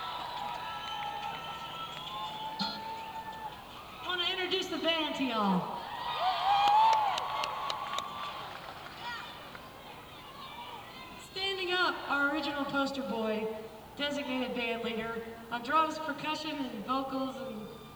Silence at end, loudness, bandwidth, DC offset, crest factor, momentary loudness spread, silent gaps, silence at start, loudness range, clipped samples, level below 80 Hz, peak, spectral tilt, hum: 0 s; -33 LUFS; over 20 kHz; under 0.1%; 22 dB; 15 LU; none; 0 s; 10 LU; under 0.1%; -64 dBFS; -12 dBFS; -4 dB/octave; none